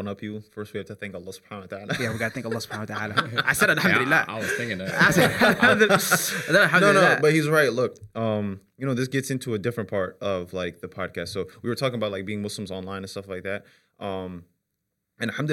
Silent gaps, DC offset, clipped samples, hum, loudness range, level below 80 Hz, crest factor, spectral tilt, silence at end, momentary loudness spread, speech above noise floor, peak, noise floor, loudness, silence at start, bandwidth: none; under 0.1%; under 0.1%; none; 12 LU; -60 dBFS; 18 dB; -4 dB/octave; 0 s; 18 LU; 56 dB; -6 dBFS; -80 dBFS; -23 LUFS; 0 s; 17 kHz